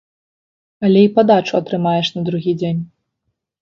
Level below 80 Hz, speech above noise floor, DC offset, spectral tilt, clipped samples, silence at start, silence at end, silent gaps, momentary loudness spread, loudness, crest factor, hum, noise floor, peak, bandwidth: -58 dBFS; 59 dB; under 0.1%; -7.5 dB/octave; under 0.1%; 0.8 s; 0.75 s; none; 10 LU; -16 LUFS; 16 dB; none; -74 dBFS; 0 dBFS; 7 kHz